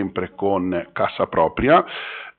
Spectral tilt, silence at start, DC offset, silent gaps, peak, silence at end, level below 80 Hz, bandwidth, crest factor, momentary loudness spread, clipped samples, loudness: -4 dB/octave; 0 s; under 0.1%; none; -4 dBFS; 0.1 s; -46 dBFS; 4.5 kHz; 18 dB; 10 LU; under 0.1%; -20 LUFS